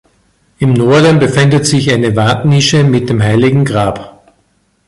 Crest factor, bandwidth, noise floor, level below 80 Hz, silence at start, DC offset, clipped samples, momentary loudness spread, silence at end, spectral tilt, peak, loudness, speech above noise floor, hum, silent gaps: 10 dB; 11.5 kHz; -56 dBFS; -40 dBFS; 0.6 s; under 0.1%; under 0.1%; 6 LU; 0.8 s; -5.5 dB/octave; 0 dBFS; -10 LUFS; 47 dB; none; none